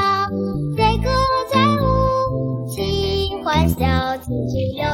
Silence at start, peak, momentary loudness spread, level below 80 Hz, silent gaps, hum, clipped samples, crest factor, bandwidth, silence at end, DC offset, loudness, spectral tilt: 0 s; -2 dBFS; 7 LU; -30 dBFS; none; none; under 0.1%; 16 dB; 17 kHz; 0 s; under 0.1%; -19 LUFS; -6.5 dB/octave